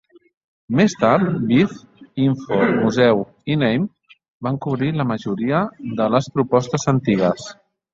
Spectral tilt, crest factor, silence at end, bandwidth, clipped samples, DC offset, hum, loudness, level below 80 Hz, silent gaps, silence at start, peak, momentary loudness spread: -6.5 dB/octave; 18 dB; 0.4 s; 7.8 kHz; under 0.1%; under 0.1%; none; -19 LUFS; -56 dBFS; 4.30-4.40 s; 0.7 s; -2 dBFS; 9 LU